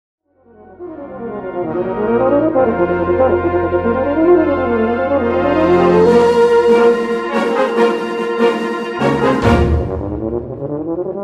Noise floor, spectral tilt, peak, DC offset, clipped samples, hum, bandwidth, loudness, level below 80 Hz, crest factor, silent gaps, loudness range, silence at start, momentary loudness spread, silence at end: -45 dBFS; -7.5 dB/octave; 0 dBFS; under 0.1%; under 0.1%; none; 11 kHz; -14 LUFS; -32 dBFS; 14 dB; none; 4 LU; 0.8 s; 12 LU; 0 s